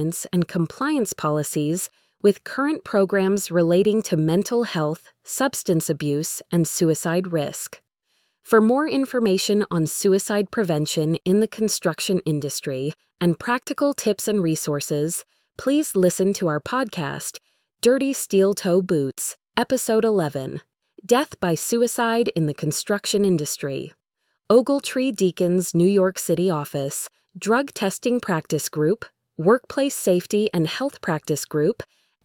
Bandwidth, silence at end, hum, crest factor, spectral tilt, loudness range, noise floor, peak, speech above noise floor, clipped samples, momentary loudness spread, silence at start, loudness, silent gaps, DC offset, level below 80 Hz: 19.5 kHz; 0.4 s; none; 18 dB; -5 dB/octave; 2 LU; -75 dBFS; -4 dBFS; 53 dB; under 0.1%; 8 LU; 0 s; -22 LUFS; none; under 0.1%; -62 dBFS